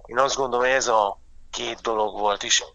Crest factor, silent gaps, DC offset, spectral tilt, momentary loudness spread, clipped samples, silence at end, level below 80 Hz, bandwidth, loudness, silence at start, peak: 20 dB; none; under 0.1%; -1 dB/octave; 11 LU; under 0.1%; 0.05 s; -50 dBFS; 8.2 kHz; -23 LUFS; 0.05 s; -4 dBFS